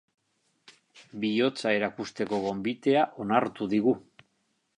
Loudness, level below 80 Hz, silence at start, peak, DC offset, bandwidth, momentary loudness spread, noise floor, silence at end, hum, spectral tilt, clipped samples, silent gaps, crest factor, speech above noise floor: -28 LUFS; -70 dBFS; 0.95 s; -8 dBFS; under 0.1%; 10.5 kHz; 8 LU; -75 dBFS; 0.8 s; none; -6 dB/octave; under 0.1%; none; 20 dB; 47 dB